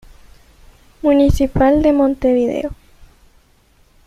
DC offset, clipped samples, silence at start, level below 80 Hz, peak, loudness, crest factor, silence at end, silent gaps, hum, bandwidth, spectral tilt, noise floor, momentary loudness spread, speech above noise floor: under 0.1%; under 0.1%; 1.05 s; -32 dBFS; -2 dBFS; -15 LUFS; 16 dB; 1 s; none; none; 13.5 kHz; -7.5 dB/octave; -53 dBFS; 8 LU; 40 dB